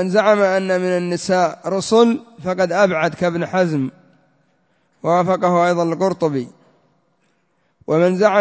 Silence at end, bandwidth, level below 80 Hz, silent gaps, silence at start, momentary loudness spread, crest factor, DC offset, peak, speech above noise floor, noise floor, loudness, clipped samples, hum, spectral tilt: 0 s; 8 kHz; -60 dBFS; none; 0 s; 10 LU; 18 dB; under 0.1%; 0 dBFS; 48 dB; -65 dBFS; -17 LUFS; under 0.1%; none; -6 dB/octave